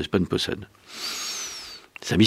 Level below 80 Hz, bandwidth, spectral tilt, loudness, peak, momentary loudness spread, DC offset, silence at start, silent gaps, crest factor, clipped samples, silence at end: -52 dBFS; 16 kHz; -4.5 dB/octave; -28 LUFS; -4 dBFS; 13 LU; under 0.1%; 0 s; none; 22 dB; under 0.1%; 0 s